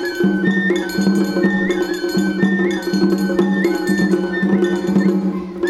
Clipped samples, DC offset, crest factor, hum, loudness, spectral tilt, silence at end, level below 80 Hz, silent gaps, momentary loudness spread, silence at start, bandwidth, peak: under 0.1%; under 0.1%; 14 dB; none; -17 LUFS; -6.5 dB/octave; 0 s; -50 dBFS; none; 3 LU; 0 s; 14 kHz; -2 dBFS